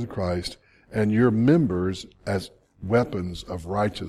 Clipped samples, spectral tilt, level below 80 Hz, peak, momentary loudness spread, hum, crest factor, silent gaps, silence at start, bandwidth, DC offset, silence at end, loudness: under 0.1%; -7 dB/octave; -48 dBFS; -6 dBFS; 15 LU; none; 18 dB; none; 0 s; 13 kHz; under 0.1%; 0 s; -25 LUFS